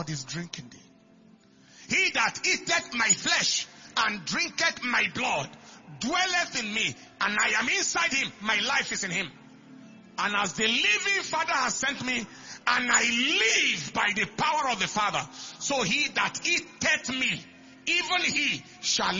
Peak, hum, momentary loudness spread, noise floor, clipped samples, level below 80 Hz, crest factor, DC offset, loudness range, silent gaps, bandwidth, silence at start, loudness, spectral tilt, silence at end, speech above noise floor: -8 dBFS; none; 9 LU; -57 dBFS; under 0.1%; -64 dBFS; 20 dB; under 0.1%; 2 LU; none; 7.6 kHz; 0 s; -25 LUFS; -1 dB/octave; 0 s; 29 dB